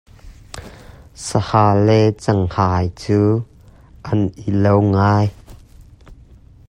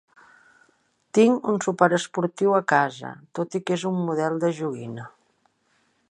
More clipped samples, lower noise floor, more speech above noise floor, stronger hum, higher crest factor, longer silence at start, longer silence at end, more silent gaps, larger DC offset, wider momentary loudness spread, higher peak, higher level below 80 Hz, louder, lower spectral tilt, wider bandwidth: neither; second, -44 dBFS vs -67 dBFS; second, 29 dB vs 44 dB; neither; about the same, 18 dB vs 22 dB; second, 0.25 s vs 1.15 s; second, 0.55 s vs 1 s; neither; neither; first, 22 LU vs 16 LU; about the same, 0 dBFS vs -2 dBFS; first, -44 dBFS vs -74 dBFS; first, -17 LUFS vs -23 LUFS; first, -7.5 dB/octave vs -5.5 dB/octave; about the same, 10.5 kHz vs 11 kHz